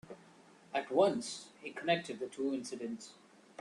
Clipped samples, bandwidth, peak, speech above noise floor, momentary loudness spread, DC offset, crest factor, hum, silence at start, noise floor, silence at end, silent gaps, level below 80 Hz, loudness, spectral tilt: under 0.1%; 11.5 kHz; -14 dBFS; 25 dB; 23 LU; under 0.1%; 22 dB; none; 0.05 s; -61 dBFS; 0.45 s; none; -80 dBFS; -36 LUFS; -4 dB/octave